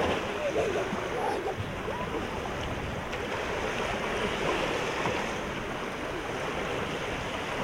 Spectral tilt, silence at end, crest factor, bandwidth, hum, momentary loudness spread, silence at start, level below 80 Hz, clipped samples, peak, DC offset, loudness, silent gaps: -4.5 dB/octave; 0 s; 16 dB; 16.5 kHz; none; 5 LU; 0 s; -48 dBFS; under 0.1%; -16 dBFS; under 0.1%; -31 LUFS; none